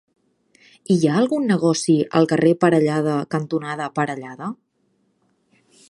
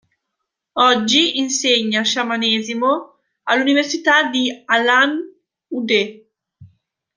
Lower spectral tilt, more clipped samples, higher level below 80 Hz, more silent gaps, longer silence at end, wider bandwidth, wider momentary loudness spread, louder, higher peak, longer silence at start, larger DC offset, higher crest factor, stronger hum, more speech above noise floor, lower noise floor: first, -6 dB/octave vs -2 dB/octave; neither; about the same, -66 dBFS vs -68 dBFS; neither; first, 1.35 s vs 0.5 s; first, 11.5 kHz vs 10 kHz; about the same, 14 LU vs 13 LU; second, -19 LUFS vs -16 LUFS; about the same, -2 dBFS vs -2 dBFS; first, 0.9 s vs 0.75 s; neither; about the same, 18 dB vs 18 dB; neither; second, 47 dB vs 61 dB; second, -66 dBFS vs -78 dBFS